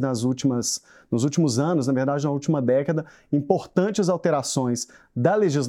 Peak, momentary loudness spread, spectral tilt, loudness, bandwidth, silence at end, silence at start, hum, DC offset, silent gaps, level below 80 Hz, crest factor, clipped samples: -6 dBFS; 6 LU; -5.5 dB/octave; -23 LUFS; 15 kHz; 0 s; 0 s; none; under 0.1%; none; -66 dBFS; 18 dB; under 0.1%